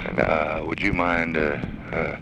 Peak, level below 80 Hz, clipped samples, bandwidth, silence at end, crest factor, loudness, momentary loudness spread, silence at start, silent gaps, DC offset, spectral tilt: -4 dBFS; -40 dBFS; under 0.1%; 9.6 kHz; 0 s; 20 dB; -24 LUFS; 6 LU; 0 s; none; under 0.1%; -7 dB/octave